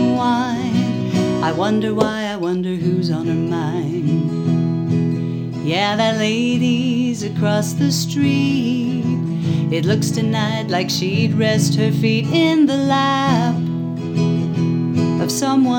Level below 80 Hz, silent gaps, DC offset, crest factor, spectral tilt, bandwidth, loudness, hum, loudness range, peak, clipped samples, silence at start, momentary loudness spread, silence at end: -56 dBFS; none; under 0.1%; 16 dB; -6 dB/octave; 17.5 kHz; -18 LUFS; none; 3 LU; 0 dBFS; under 0.1%; 0 s; 5 LU; 0 s